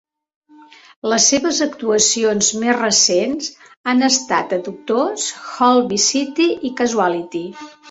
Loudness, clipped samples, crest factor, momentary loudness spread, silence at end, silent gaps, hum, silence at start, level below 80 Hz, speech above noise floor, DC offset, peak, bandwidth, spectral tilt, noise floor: -16 LUFS; under 0.1%; 18 dB; 13 LU; 0.2 s; 3.77-3.84 s; none; 1.05 s; -60 dBFS; 28 dB; under 0.1%; 0 dBFS; 8.2 kHz; -2 dB/octave; -45 dBFS